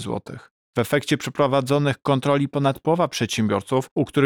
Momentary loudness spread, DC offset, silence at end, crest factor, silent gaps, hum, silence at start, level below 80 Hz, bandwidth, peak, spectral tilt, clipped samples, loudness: 9 LU; under 0.1%; 0 s; 14 dB; 0.51-0.73 s, 3.91-3.96 s; none; 0 s; -58 dBFS; 19 kHz; -8 dBFS; -6 dB/octave; under 0.1%; -22 LUFS